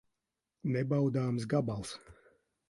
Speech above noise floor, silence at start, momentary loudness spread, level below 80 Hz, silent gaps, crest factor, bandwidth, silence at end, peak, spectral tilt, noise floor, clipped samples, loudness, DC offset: 55 dB; 0.65 s; 12 LU; -64 dBFS; none; 18 dB; 11.5 kHz; 0.55 s; -16 dBFS; -7.5 dB/octave; -88 dBFS; under 0.1%; -33 LUFS; under 0.1%